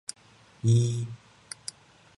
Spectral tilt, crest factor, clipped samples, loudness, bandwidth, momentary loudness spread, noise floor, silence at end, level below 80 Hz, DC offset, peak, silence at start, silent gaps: -6 dB/octave; 18 dB; under 0.1%; -28 LUFS; 11.5 kHz; 19 LU; -46 dBFS; 1 s; -64 dBFS; under 0.1%; -12 dBFS; 0.65 s; none